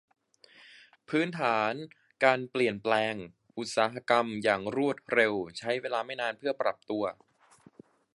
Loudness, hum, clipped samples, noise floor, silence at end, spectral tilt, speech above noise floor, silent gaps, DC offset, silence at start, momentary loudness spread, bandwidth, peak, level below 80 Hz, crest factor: -29 LUFS; none; under 0.1%; -60 dBFS; 1.05 s; -4.5 dB/octave; 31 dB; none; under 0.1%; 1.1 s; 8 LU; 11.5 kHz; -6 dBFS; -72 dBFS; 24 dB